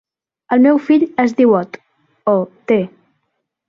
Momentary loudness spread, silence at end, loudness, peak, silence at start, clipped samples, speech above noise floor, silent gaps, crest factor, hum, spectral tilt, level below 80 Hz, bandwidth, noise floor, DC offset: 9 LU; 0.8 s; -15 LUFS; -2 dBFS; 0.5 s; under 0.1%; 58 dB; none; 14 dB; none; -8 dB/octave; -62 dBFS; 7 kHz; -72 dBFS; under 0.1%